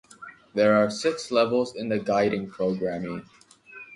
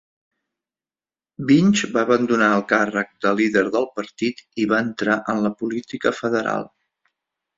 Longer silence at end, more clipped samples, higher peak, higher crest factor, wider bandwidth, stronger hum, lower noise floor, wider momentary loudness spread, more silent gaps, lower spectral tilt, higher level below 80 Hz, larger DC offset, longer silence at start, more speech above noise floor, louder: second, 0 s vs 0.9 s; neither; second, -8 dBFS vs -2 dBFS; about the same, 18 dB vs 20 dB; first, 11.5 kHz vs 7.8 kHz; neither; second, -47 dBFS vs under -90 dBFS; first, 17 LU vs 10 LU; neither; about the same, -5.5 dB/octave vs -5.5 dB/octave; about the same, -62 dBFS vs -62 dBFS; neither; second, 0.2 s vs 1.4 s; second, 23 dB vs over 70 dB; second, -25 LUFS vs -20 LUFS